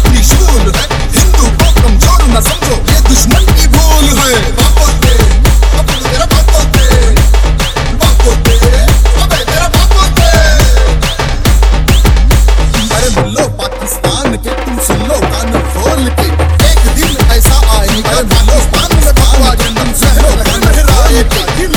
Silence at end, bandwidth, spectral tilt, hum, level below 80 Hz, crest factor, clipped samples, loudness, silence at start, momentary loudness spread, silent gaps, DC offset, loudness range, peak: 0 s; 19.5 kHz; -4 dB/octave; none; -8 dBFS; 6 dB; 0.2%; -9 LUFS; 0 s; 5 LU; none; under 0.1%; 3 LU; 0 dBFS